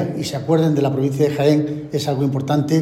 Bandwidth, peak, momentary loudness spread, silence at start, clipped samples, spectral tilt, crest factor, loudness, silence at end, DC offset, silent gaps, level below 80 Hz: 15.5 kHz; -2 dBFS; 7 LU; 0 s; under 0.1%; -7 dB/octave; 16 dB; -19 LUFS; 0 s; under 0.1%; none; -56 dBFS